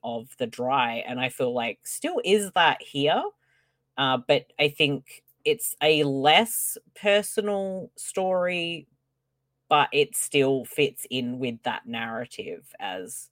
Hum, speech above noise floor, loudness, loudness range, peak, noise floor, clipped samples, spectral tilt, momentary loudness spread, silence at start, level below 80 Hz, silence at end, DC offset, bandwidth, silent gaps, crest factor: none; 53 dB; -25 LUFS; 3 LU; -4 dBFS; -78 dBFS; under 0.1%; -3 dB/octave; 13 LU; 0.05 s; -72 dBFS; 0.05 s; under 0.1%; 17 kHz; none; 22 dB